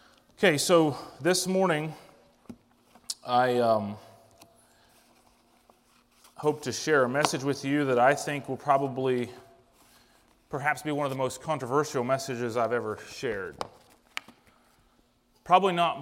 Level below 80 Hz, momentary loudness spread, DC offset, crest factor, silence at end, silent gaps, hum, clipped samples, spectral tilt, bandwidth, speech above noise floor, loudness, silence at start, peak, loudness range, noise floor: -68 dBFS; 16 LU; under 0.1%; 26 dB; 0 s; none; none; under 0.1%; -4.5 dB/octave; 16 kHz; 39 dB; -27 LUFS; 0.4 s; -4 dBFS; 6 LU; -66 dBFS